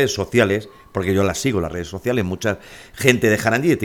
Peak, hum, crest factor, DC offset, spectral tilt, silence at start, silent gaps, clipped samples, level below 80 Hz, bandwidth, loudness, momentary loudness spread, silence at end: 0 dBFS; none; 20 dB; under 0.1%; -5 dB/octave; 0 s; none; under 0.1%; -46 dBFS; 18.5 kHz; -19 LUFS; 10 LU; 0 s